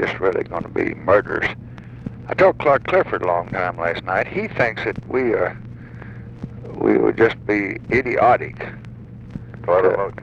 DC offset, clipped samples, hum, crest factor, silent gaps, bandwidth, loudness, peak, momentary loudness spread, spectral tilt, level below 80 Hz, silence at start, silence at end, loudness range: under 0.1%; under 0.1%; none; 18 dB; none; 7.8 kHz; -19 LUFS; -2 dBFS; 20 LU; -7.5 dB/octave; -46 dBFS; 0 s; 0 s; 3 LU